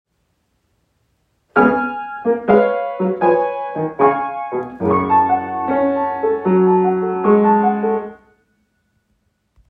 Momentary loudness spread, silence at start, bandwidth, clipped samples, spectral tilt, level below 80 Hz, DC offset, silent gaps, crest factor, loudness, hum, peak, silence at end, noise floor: 9 LU; 1.55 s; 4.5 kHz; under 0.1%; -10.5 dB/octave; -56 dBFS; under 0.1%; none; 16 dB; -17 LUFS; none; 0 dBFS; 1.55 s; -66 dBFS